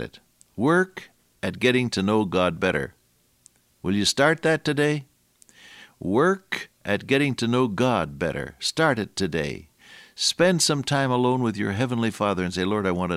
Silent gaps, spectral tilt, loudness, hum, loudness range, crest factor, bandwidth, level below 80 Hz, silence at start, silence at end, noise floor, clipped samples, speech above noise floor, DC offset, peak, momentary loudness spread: none; -4.5 dB/octave; -23 LUFS; none; 2 LU; 18 dB; 15.5 kHz; -54 dBFS; 0 s; 0 s; -59 dBFS; under 0.1%; 36 dB; under 0.1%; -6 dBFS; 12 LU